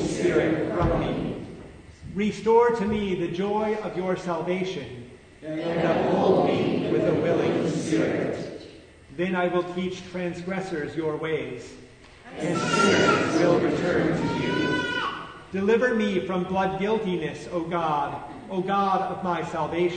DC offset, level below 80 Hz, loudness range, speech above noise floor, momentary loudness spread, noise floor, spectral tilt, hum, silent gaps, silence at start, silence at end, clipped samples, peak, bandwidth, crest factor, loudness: under 0.1%; -48 dBFS; 6 LU; 22 dB; 13 LU; -47 dBFS; -6 dB/octave; none; none; 0 s; 0 s; under 0.1%; -8 dBFS; 9.6 kHz; 18 dB; -25 LUFS